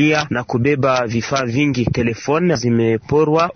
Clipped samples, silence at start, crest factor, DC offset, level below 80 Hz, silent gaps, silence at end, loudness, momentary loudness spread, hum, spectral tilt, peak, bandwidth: under 0.1%; 0 s; 12 dB; under 0.1%; -44 dBFS; none; 0.05 s; -17 LUFS; 4 LU; none; -6 dB/octave; -4 dBFS; 6.6 kHz